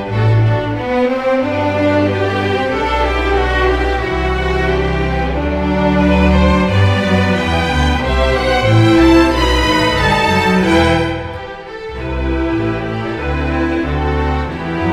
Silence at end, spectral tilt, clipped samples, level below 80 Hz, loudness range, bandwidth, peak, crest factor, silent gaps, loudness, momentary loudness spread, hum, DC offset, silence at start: 0 s; -6.5 dB/octave; under 0.1%; -22 dBFS; 5 LU; 13.5 kHz; 0 dBFS; 14 dB; none; -14 LUFS; 8 LU; none; 0.6%; 0 s